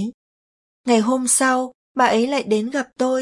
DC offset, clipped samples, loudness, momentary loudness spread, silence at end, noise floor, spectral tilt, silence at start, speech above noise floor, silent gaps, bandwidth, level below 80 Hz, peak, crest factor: under 0.1%; under 0.1%; -19 LUFS; 11 LU; 0 s; under -90 dBFS; -3 dB/octave; 0 s; over 72 dB; 0.14-0.84 s, 1.75-1.95 s; 11.5 kHz; -68 dBFS; -4 dBFS; 16 dB